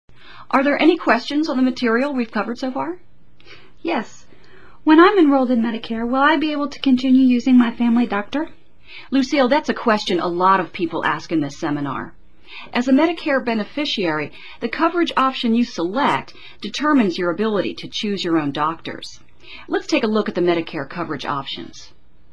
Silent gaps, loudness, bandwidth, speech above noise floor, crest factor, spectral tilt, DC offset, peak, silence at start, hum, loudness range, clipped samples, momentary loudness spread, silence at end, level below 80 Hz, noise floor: none; -19 LUFS; 8.2 kHz; 30 dB; 18 dB; -5.5 dB/octave; 1%; 0 dBFS; 0.35 s; none; 6 LU; under 0.1%; 14 LU; 0.5 s; -54 dBFS; -48 dBFS